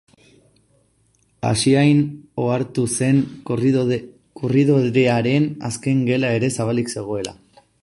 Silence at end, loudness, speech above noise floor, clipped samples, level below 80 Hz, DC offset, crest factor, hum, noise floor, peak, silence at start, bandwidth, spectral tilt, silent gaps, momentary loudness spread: 0.5 s; -19 LUFS; 43 dB; under 0.1%; -54 dBFS; under 0.1%; 16 dB; none; -61 dBFS; -4 dBFS; 1.45 s; 11.5 kHz; -6 dB/octave; none; 10 LU